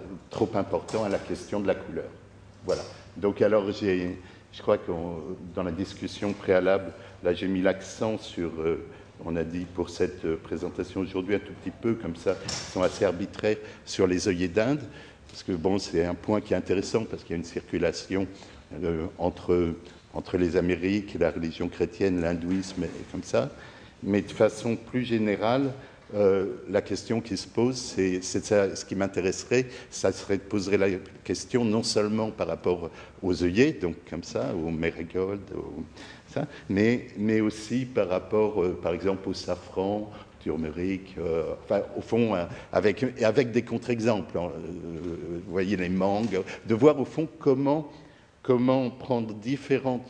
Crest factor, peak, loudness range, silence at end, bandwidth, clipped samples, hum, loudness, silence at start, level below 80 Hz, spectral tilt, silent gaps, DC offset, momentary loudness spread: 22 dB; -6 dBFS; 4 LU; 0 s; 10.5 kHz; under 0.1%; none; -28 LUFS; 0 s; -54 dBFS; -6 dB/octave; none; under 0.1%; 11 LU